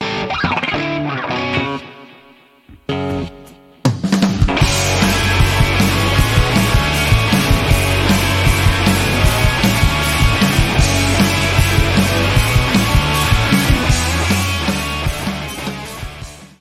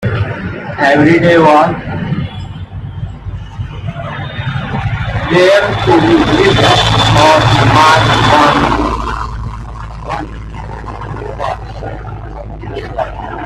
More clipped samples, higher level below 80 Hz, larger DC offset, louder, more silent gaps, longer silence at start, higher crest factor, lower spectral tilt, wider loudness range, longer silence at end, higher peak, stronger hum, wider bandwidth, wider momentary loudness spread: neither; first, -22 dBFS vs -28 dBFS; neither; second, -15 LUFS vs -10 LUFS; neither; about the same, 0 s vs 0 s; about the same, 14 dB vs 12 dB; about the same, -4.5 dB/octave vs -5.5 dB/octave; second, 7 LU vs 15 LU; first, 0.15 s vs 0 s; about the same, 0 dBFS vs 0 dBFS; neither; first, 16.5 kHz vs 13 kHz; second, 10 LU vs 19 LU